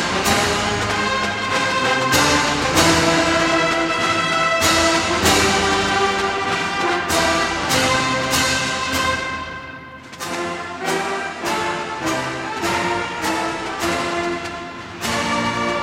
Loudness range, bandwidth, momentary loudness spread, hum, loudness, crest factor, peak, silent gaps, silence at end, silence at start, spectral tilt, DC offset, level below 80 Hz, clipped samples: 7 LU; 16.5 kHz; 11 LU; none; -18 LUFS; 18 dB; -2 dBFS; none; 0 s; 0 s; -3 dB/octave; under 0.1%; -42 dBFS; under 0.1%